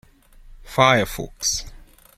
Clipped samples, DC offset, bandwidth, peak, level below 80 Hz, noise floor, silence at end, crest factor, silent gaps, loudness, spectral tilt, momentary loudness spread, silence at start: under 0.1%; under 0.1%; 16.5 kHz; -2 dBFS; -42 dBFS; -47 dBFS; 0.4 s; 22 dB; none; -20 LUFS; -3 dB/octave; 12 LU; 0.5 s